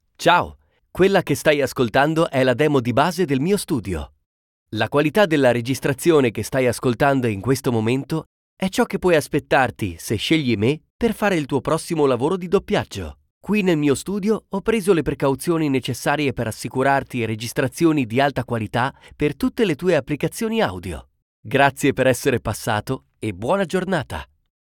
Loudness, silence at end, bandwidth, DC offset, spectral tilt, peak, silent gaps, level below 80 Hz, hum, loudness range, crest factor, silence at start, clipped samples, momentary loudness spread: -20 LUFS; 0.45 s; 19 kHz; under 0.1%; -5.5 dB/octave; -2 dBFS; 4.26-4.66 s, 8.26-8.57 s, 10.90-10.99 s, 13.30-13.41 s, 21.22-21.43 s; -46 dBFS; none; 3 LU; 18 dB; 0.2 s; under 0.1%; 9 LU